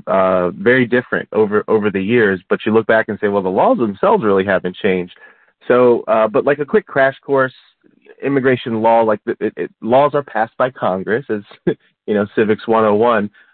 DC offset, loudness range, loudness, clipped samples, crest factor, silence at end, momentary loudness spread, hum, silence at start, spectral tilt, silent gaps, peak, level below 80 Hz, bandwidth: under 0.1%; 2 LU; -16 LUFS; under 0.1%; 14 dB; 0.25 s; 8 LU; none; 0.05 s; -11.5 dB/octave; none; -2 dBFS; -58 dBFS; 4.4 kHz